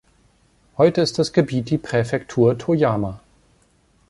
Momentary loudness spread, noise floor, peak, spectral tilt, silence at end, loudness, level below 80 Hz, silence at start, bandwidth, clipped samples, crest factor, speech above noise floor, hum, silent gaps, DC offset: 7 LU; -59 dBFS; -2 dBFS; -6.5 dB/octave; 0.9 s; -20 LUFS; -52 dBFS; 0.8 s; 11.5 kHz; under 0.1%; 18 dB; 40 dB; none; none; under 0.1%